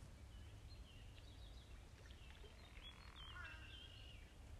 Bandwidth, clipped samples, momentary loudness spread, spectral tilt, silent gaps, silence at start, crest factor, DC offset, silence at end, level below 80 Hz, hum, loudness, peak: 14.5 kHz; under 0.1%; 6 LU; -4 dB/octave; none; 0 s; 16 dB; under 0.1%; 0 s; -62 dBFS; none; -59 LUFS; -42 dBFS